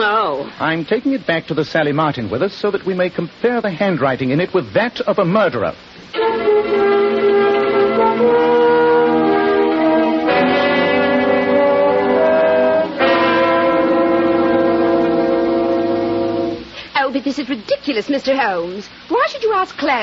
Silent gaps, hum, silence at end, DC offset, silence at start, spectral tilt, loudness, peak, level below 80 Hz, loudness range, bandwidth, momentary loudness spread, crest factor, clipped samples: none; none; 0 s; under 0.1%; 0 s; -7 dB/octave; -16 LUFS; -2 dBFS; -52 dBFS; 5 LU; 7.2 kHz; 7 LU; 12 dB; under 0.1%